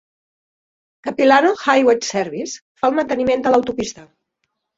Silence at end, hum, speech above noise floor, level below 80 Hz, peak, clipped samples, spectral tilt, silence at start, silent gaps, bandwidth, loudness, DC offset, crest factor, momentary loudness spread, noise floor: 0.75 s; none; 57 dB; -56 dBFS; -2 dBFS; under 0.1%; -3.5 dB/octave; 1.05 s; 2.62-2.75 s; 7.8 kHz; -17 LUFS; under 0.1%; 18 dB; 14 LU; -74 dBFS